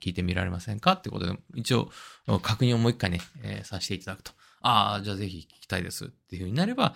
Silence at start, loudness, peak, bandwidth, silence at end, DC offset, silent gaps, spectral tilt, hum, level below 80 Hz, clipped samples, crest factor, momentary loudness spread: 0 s; -28 LUFS; -6 dBFS; 16 kHz; 0 s; under 0.1%; none; -5.5 dB/octave; none; -56 dBFS; under 0.1%; 22 dB; 14 LU